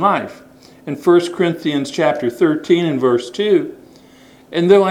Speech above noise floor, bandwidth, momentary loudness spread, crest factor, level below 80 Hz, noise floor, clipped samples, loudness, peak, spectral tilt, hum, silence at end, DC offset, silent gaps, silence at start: 30 dB; 12.5 kHz; 11 LU; 16 dB; -62 dBFS; -45 dBFS; under 0.1%; -16 LUFS; 0 dBFS; -6 dB/octave; none; 0 s; under 0.1%; none; 0 s